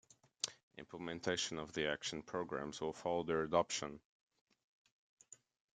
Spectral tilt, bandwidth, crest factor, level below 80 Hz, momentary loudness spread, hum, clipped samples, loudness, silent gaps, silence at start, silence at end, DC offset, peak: -3 dB/octave; 9.6 kHz; 24 dB; -74 dBFS; 21 LU; none; under 0.1%; -41 LUFS; 0.63-0.71 s, 4.05-4.27 s, 4.41-4.47 s, 4.64-4.85 s, 4.92-5.17 s; 0.45 s; 0.4 s; under 0.1%; -18 dBFS